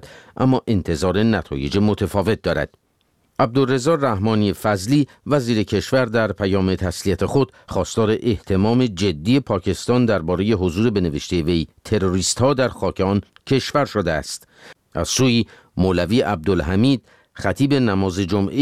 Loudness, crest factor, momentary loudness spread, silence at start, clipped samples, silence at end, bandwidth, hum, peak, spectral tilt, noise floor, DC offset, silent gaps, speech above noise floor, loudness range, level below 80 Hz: -20 LUFS; 16 dB; 5 LU; 0.05 s; under 0.1%; 0 s; 15.5 kHz; none; -4 dBFS; -5.5 dB/octave; -64 dBFS; 0.3%; none; 45 dB; 2 LU; -42 dBFS